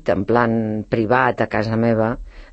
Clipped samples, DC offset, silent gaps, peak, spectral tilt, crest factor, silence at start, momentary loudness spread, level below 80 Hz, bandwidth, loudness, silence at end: under 0.1%; under 0.1%; none; -2 dBFS; -8.5 dB/octave; 18 dB; 0.05 s; 5 LU; -42 dBFS; 7.8 kHz; -19 LUFS; 0.05 s